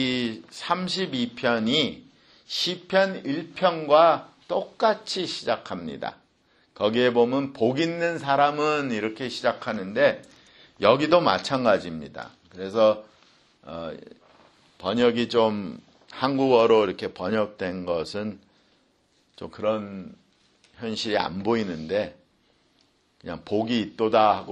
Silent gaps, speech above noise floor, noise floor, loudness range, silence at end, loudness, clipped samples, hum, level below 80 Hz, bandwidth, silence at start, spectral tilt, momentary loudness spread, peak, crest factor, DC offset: none; 42 dB; -66 dBFS; 7 LU; 0 s; -24 LUFS; under 0.1%; none; -64 dBFS; 11.5 kHz; 0 s; -5 dB/octave; 17 LU; -4 dBFS; 22 dB; under 0.1%